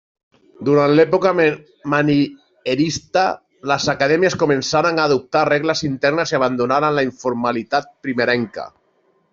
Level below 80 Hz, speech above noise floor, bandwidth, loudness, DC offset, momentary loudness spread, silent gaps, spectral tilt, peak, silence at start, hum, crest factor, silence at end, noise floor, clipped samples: -56 dBFS; 44 dB; 7.6 kHz; -18 LUFS; under 0.1%; 9 LU; none; -5 dB/octave; -2 dBFS; 0.6 s; none; 16 dB; 0.65 s; -61 dBFS; under 0.1%